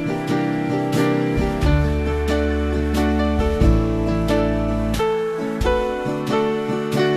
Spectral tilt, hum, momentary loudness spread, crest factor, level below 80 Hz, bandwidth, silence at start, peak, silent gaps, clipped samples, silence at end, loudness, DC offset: -7 dB/octave; none; 4 LU; 16 dB; -26 dBFS; 14 kHz; 0 s; -4 dBFS; none; under 0.1%; 0 s; -20 LUFS; under 0.1%